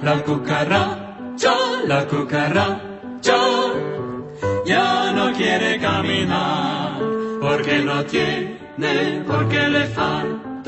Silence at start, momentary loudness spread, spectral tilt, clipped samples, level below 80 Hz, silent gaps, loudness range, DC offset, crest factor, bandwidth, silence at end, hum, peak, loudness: 0 s; 8 LU; -5 dB/octave; under 0.1%; -52 dBFS; none; 1 LU; under 0.1%; 18 dB; 8.4 kHz; 0 s; none; -2 dBFS; -20 LUFS